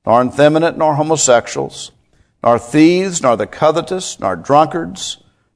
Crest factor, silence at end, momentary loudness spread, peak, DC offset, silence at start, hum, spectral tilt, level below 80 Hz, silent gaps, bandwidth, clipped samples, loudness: 14 dB; 0.4 s; 13 LU; 0 dBFS; under 0.1%; 0.05 s; none; -4.5 dB/octave; -52 dBFS; none; 11 kHz; 0.2%; -14 LUFS